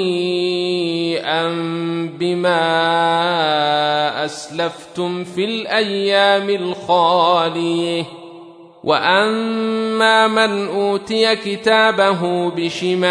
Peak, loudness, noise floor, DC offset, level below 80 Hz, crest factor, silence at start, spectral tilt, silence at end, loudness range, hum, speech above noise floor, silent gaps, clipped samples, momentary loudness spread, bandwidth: -2 dBFS; -17 LUFS; -40 dBFS; under 0.1%; -68 dBFS; 16 dB; 0 s; -4.5 dB/octave; 0 s; 2 LU; none; 23 dB; none; under 0.1%; 9 LU; 11 kHz